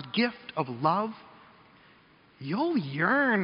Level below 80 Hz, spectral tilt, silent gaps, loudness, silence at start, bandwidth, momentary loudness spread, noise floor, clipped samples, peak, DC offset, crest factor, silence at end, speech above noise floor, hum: -74 dBFS; -4 dB/octave; none; -28 LUFS; 0 s; 5.4 kHz; 12 LU; -59 dBFS; under 0.1%; -10 dBFS; under 0.1%; 20 dB; 0 s; 31 dB; none